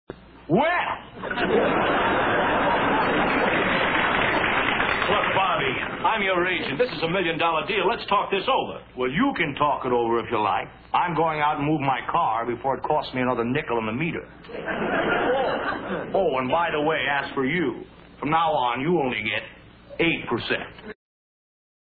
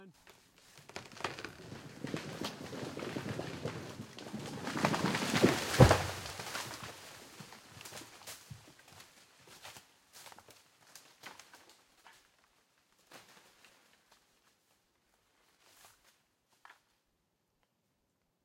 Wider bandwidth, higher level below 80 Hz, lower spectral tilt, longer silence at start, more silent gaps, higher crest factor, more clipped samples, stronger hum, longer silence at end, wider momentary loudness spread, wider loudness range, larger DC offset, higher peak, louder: second, 4.9 kHz vs 16.5 kHz; about the same, -50 dBFS vs -54 dBFS; first, -8.5 dB/octave vs -5 dB/octave; about the same, 0.1 s vs 0 s; neither; second, 16 dB vs 32 dB; neither; neither; second, 1 s vs 2.55 s; second, 8 LU vs 27 LU; second, 4 LU vs 25 LU; neither; about the same, -8 dBFS vs -6 dBFS; first, -23 LUFS vs -35 LUFS